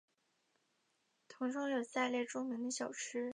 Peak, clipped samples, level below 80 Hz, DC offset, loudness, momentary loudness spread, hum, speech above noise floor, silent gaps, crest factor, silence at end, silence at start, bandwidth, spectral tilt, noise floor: -24 dBFS; under 0.1%; under -90 dBFS; under 0.1%; -40 LUFS; 5 LU; none; 41 dB; none; 18 dB; 0 s; 1.3 s; 10.5 kHz; -2.5 dB/octave; -80 dBFS